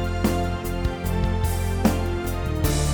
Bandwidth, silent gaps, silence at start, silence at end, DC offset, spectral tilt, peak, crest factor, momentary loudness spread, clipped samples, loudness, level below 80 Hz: over 20 kHz; none; 0 s; 0 s; under 0.1%; -6 dB/octave; -4 dBFS; 18 dB; 4 LU; under 0.1%; -25 LUFS; -28 dBFS